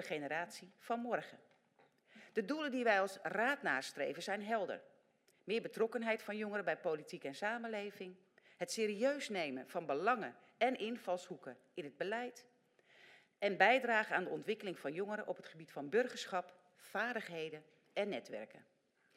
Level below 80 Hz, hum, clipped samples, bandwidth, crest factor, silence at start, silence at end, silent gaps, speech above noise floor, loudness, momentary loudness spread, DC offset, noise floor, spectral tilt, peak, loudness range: under -90 dBFS; none; under 0.1%; 16 kHz; 26 dB; 0 s; 0.55 s; none; 35 dB; -39 LUFS; 15 LU; under 0.1%; -74 dBFS; -4 dB/octave; -16 dBFS; 5 LU